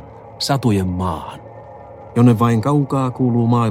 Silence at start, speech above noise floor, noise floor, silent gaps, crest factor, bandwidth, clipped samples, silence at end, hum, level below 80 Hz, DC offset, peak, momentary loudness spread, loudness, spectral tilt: 0 s; 21 dB; -37 dBFS; none; 16 dB; 15 kHz; under 0.1%; 0 s; none; -46 dBFS; under 0.1%; -2 dBFS; 23 LU; -17 LUFS; -7 dB/octave